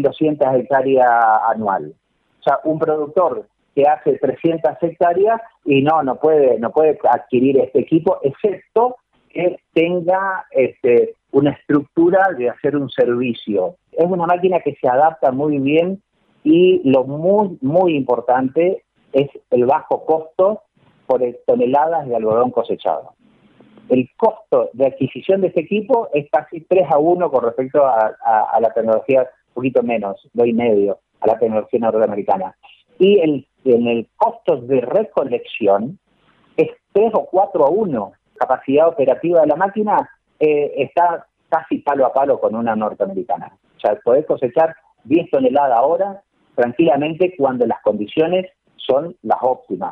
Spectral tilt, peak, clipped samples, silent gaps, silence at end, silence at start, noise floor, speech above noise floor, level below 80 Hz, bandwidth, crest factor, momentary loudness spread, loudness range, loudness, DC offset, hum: -9.5 dB/octave; -2 dBFS; under 0.1%; none; 0 s; 0 s; -56 dBFS; 40 dB; -62 dBFS; 4.2 kHz; 14 dB; 7 LU; 3 LU; -17 LUFS; under 0.1%; none